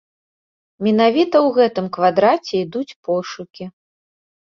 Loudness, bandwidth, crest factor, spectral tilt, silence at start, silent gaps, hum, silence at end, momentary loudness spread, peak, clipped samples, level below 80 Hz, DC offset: -17 LUFS; 7.2 kHz; 18 dB; -6.5 dB/octave; 0.8 s; 2.96-3.03 s; none; 0.9 s; 17 LU; -2 dBFS; under 0.1%; -64 dBFS; under 0.1%